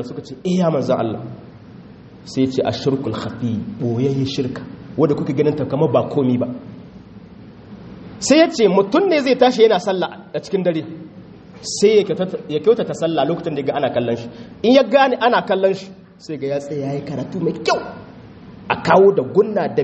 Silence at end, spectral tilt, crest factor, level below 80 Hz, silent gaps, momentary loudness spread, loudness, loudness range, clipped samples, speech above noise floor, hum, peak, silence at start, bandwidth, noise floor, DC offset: 0 s; -5.5 dB/octave; 18 dB; -54 dBFS; none; 19 LU; -18 LUFS; 6 LU; under 0.1%; 23 dB; none; 0 dBFS; 0 s; 8.4 kHz; -40 dBFS; under 0.1%